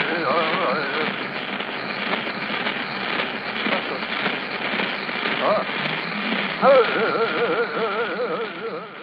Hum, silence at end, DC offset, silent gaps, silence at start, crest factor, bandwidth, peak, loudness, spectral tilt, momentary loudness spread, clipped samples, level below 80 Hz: none; 0 s; under 0.1%; none; 0 s; 18 dB; 5.8 kHz; -4 dBFS; -22 LUFS; -6.5 dB/octave; 7 LU; under 0.1%; -64 dBFS